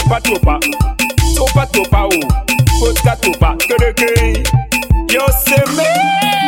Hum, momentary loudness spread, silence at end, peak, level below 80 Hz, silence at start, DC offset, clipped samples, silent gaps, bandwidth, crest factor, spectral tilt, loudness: none; 3 LU; 0 s; 0 dBFS; -18 dBFS; 0 s; under 0.1%; under 0.1%; none; 17 kHz; 12 dB; -4.5 dB/octave; -12 LUFS